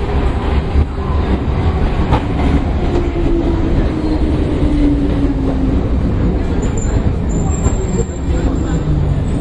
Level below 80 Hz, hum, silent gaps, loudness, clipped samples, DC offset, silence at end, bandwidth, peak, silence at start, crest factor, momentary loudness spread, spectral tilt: -18 dBFS; none; none; -16 LUFS; under 0.1%; under 0.1%; 0 s; 8.6 kHz; 0 dBFS; 0 s; 14 dB; 2 LU; -7.5 dB/octave